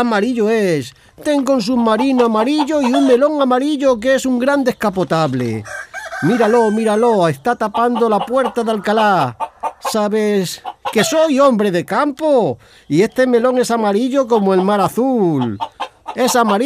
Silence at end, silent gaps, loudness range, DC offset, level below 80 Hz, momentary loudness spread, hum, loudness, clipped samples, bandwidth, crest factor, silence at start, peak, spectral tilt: 0 s; none; 2 LU; under 0.1%; -54 dBFS; 9 LU; none; -15 LUFS; under 0.1%; 15.5 kHz; 14 dB; 0 s; 0 dBFS; -5.5 dB/octave